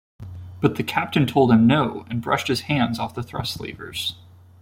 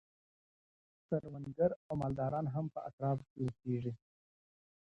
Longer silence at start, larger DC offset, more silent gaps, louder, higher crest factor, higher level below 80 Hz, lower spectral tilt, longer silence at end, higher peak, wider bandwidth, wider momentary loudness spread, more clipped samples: second, 0.2 s vs 1.1 s; neither; second, none vs 1.76-1.90 s, 2.93-2.98 s, 3.30-3.36 s; first, -22 LUFS vs -39 LUFS; about the same, 18 dB vs 20 dB; first, -52 dBFS vs -66 dBFS; second, -6 dB/octave vs -10.5 dB/octave; second, 0.5 s vs 0.9 s; first, -4 dBFS vs -18 dBFS; first, 16.5 kHz vs 7.6 kHz; first, 15 LU vs 8 LU; neither